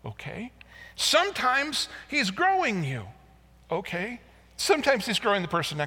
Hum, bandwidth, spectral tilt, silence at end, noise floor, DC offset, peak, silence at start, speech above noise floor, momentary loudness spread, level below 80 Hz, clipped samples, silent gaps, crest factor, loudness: none; 18 kHz; -3 dB/octave; 0 s; -55 dBFS; under 0.1%; -6 dBFS; 0.05 s; 28 dB; 17 LU; -58 dBFS; under 0.1%; none; 20 dB; -26 LUFS